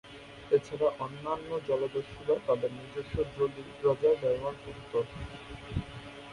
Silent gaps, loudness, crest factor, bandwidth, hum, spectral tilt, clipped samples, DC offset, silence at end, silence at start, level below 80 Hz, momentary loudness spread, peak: none; -32 LUFS; 18 dB; 11 kHz; none; -7 dB/octave; under 0.1%; under 0.1%; 0 s; 0.05 s; -52 dBFS; 16 LU; -14 dBFS